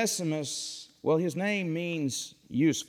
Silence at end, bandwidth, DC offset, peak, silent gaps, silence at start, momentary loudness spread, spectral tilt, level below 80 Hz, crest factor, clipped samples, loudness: 0 s; 17 kHz; under 0.1%; -14 dBFS; none; 0 s; 7 LU; -4.5 dB/octave; -74 dBFS; 14 dB; under 0.1%; -30 LUFS